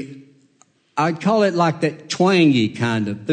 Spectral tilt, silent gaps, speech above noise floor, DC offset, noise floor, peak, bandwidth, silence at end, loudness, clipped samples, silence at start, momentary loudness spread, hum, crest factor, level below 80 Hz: -6 dB/octave; none; 41 dB; under 0.1%; -58 dBFS; -4 dBFS; 9.4 kHz; 0 s; -18 LUFS; under 0.1%; 0 s; 9 LU; none; 14 dB; -66 dBFS